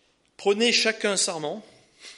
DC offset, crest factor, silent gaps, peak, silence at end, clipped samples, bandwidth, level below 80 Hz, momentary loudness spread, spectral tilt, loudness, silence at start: under 0.1%; 18 dB; none; -8 dBFS; 0.05 s; under 0.1%; 11.5 kHz; -78 dBFS; 13 LU; -1.5 dB/octave; -23 LUFS; 0.4 s